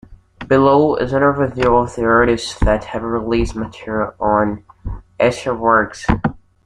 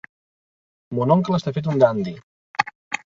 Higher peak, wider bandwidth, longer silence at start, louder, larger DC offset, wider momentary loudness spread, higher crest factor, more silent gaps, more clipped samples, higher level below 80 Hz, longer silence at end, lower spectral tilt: about the same, -2 dBFS vs -2 dBFS; first, 11 kHz vs 7.6 kHz; second, 0.1 s vs 0.9 s; first, -16 LUFS vs -21 LUFS; neither; about the same, 11 LU vs 12 LU; about the same, 16 dB vs 20 dB; second, none vs 2.23-2.54 s, 2.75-2.91 s; neither; first, -30 dBFS vs -60 dBFS; first, 0.3 s vs 0.1 s; about the same, -6.5 dB/octave vs -7 dB/octave